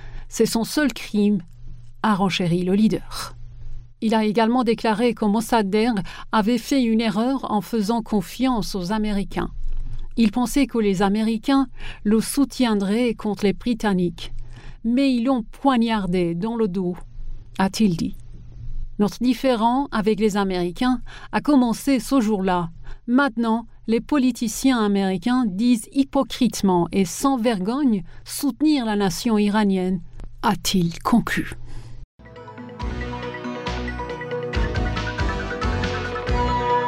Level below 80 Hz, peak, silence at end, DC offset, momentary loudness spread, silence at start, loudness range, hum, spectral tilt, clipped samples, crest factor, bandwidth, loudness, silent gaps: -36 dBFS; -6 dBFS; 0 s; under 0.1%; 11 LU; 0 s; 4 LU; none; -5.5 dB/octave; under 0.1%; 16 dB; 16 kHz; -22 LUFS; 32.04-32.18 s